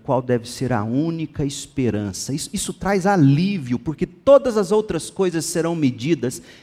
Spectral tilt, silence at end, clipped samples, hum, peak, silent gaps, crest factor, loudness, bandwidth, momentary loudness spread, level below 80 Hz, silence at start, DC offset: -6 dB/octave; 0.1 s; under 0.1%; none; -2 dBFS; none; 18 dB; -20 LUFS; 15.5 kHz; 11 LU; -48 dBFS; 0.05 s; under 0.1%